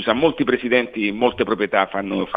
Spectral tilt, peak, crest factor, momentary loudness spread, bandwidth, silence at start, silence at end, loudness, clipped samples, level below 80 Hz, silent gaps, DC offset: -8 dB/octave; -2 dBFS; 18 dB; 4 LU; 5 kHz; 0 s; 0 s; -20 LUFS; under 0.1%; -52 dBFS; none; under 0.1%